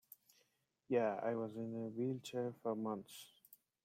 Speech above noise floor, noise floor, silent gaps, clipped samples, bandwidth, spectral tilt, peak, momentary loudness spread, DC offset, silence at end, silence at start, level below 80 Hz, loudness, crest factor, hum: 40 dB; -81 dBFS; none; under 0.1%; 16.5 kHz; -6.5 dB/octave; -24 dBFS; 19 LU; under 0.1%; 0.3 s; 0.9 s; -86 dBFS; -42 LUFS; 18 dB; none